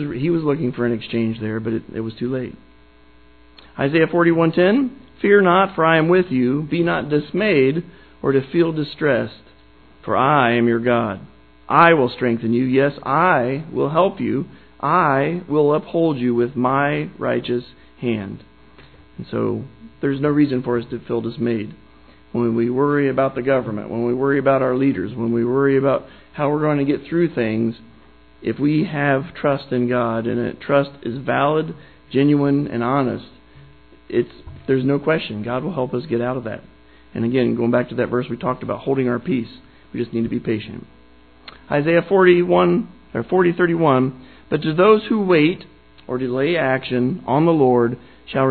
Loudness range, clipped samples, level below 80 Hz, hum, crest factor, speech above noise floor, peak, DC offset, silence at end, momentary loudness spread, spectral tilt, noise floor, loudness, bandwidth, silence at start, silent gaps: 6 LU; under 0.1%; -52 dBFS; none; 20 dB; 32 dB; 0 dBFS; 0.3%; 0 s; 11 LU; -11 dB/octave; -50 dBFS; -19 LUFS; 4.5 kHz; 0 s; none